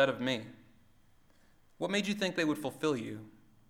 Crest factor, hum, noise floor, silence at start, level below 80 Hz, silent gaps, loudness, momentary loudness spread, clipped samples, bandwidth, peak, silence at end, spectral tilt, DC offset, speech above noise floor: 22 dB; none; -63 dBFS; 0 s; -70 dBFS; none; -34 LUFS; 12 LU; under 0.1%; 17 kHz; -14 dBFS; 0.4 s; -4.5 dB/octave; under 0.1%; 30 dB